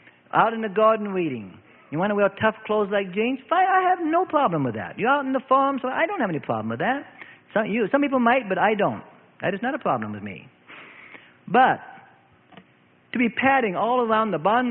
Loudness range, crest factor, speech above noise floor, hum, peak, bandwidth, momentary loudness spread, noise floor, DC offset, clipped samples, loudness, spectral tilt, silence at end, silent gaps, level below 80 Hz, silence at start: 4 LU; 20 dB; 36 dB; none; -4 dBFS; 4.1 kHz; 11 LU; -58 dBFS; under 0.1%; under 0.1%; -23 LUFS; -10.5 dB/octave; 0 s; none; -68 dBFS; 0.35 s